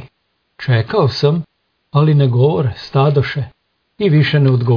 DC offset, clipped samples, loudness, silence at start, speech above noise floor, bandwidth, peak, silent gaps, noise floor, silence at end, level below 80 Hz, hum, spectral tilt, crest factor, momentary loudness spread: under 0.1%; under 0.1%; -15 LUFS; 0 s; 53 dB; 5.4 kHz; -2 dBFS; none; -66 dBFS; 0 s; -50 dBFS; none; -8.5 dB/octave; 14 dB; 11 LU